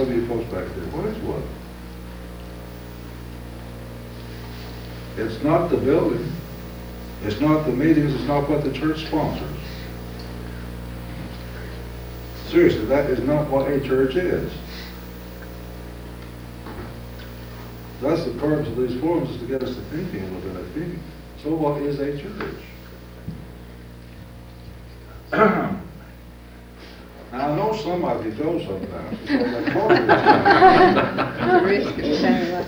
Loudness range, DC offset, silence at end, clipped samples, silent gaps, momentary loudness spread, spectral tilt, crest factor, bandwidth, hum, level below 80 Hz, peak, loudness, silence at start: 16 LU; under 0.1%; 0 s; under 0.1%; none; 21 LU; -7 dB/octave; 22 dB; over 20 kHz; 60 Hz at -40 dBFS; -40 dBFS; 0 dBFS; -21 LUFS; 0 s